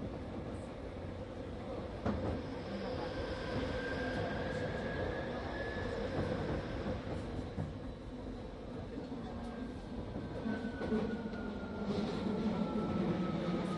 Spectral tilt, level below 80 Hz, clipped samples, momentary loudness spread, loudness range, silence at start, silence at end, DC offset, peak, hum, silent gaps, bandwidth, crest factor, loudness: -7.5 dB/octave; -50 dBFS; under 0.1%; 9 LU; 5 LU; 0 s; 0 s; under 0.1%; -24 dBFS; none; none; 11.5 kHz; 16 dB; -40 LUFS